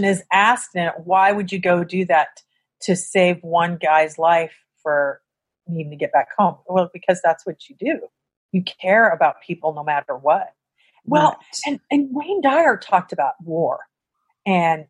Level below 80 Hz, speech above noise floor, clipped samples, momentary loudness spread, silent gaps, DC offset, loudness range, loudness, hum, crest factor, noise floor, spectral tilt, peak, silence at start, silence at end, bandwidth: -70 dBFS; 54 dB; under 0.1%; 12 LU; 8.37-8.49 s; under 0.1%; 3 LU; -19 LUFS; none; 18 dB; -73 dBFS; -5 dB/octave; -2 dBFS; 0 s; 0.05 s; 11.5 kHz